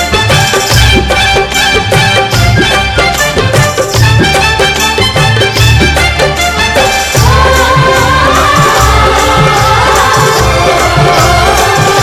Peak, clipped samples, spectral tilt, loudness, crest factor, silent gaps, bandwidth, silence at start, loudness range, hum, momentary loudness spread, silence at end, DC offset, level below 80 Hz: 0 dBFS; 2%; -3.5 dB/octave; -6 LUFS; 6 dB; none; 19 kHz; 0 s; 1 LU; none; 2 LU; 0 s; under 0.1%; -18 dBFS